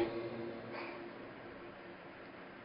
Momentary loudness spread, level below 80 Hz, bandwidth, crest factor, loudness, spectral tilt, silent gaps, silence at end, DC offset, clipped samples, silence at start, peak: 9 LU; -72 dBFS; 5.2 kHz; 22 dB; -47 LUFS; -4.5 dB/octave; none; 0 s; under 0.1%; under 0.1%; 0 s; -24 dBFS